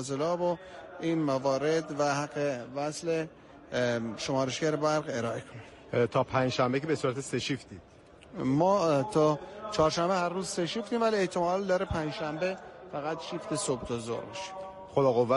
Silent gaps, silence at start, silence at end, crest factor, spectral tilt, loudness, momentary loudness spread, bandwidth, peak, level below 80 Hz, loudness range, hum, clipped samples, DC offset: none; 0 s; 0 s; 16 dB; -5 dB/octave; -30 LUFS; 11 LU; 11.5 kHz; -14 dBFS; -58 dBFS; 4 LU; none; under 0.1%; under 0.1%